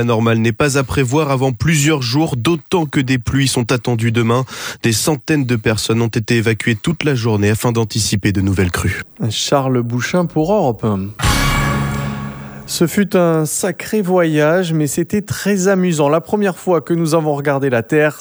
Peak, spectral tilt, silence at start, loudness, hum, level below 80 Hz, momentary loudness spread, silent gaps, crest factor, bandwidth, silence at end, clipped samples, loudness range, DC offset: 0 dBFS; -5 dB/octave; 0 s; -16 LUFS; none; -34 dBFS; 5 LU; none; 14 dB; over 20 kHz; 0 s; under 0.1%; 1 LU; under 0.1%